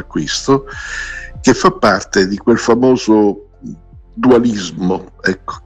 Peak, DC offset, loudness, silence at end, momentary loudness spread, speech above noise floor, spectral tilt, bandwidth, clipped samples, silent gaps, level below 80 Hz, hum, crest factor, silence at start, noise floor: 0 dBFS; under 0.1%; -14 LUFS; 0.05 s; 14 LU; 19 dB; -5 dB/octave; 9.2 kHz; under 0.1%; none; -38 dBFS; none; 14 dB; 0 s; -33 dBFS